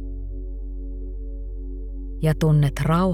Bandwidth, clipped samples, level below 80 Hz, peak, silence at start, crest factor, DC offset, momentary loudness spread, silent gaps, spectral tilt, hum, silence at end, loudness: 14.5 kHz; under 0.1%; -30 dBFS; -6 dBFS; 0 s; 16 dB; under 0.1%; 16 LU; none; -8 dB/octave; none; 0 s; -25 LUFS